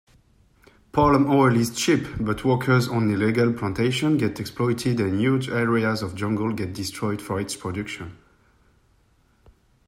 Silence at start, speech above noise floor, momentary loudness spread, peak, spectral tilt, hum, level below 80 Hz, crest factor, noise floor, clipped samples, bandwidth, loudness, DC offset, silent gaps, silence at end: 0.95 s; 39 dB; 10 LU; -6 dBFS; -6 dB/octave; none; -50 dBFS; 16 dB; -61 dBFS; under 0.1%; 16 kHz; -23 LUFS; under 0.1%; none; 1.75 s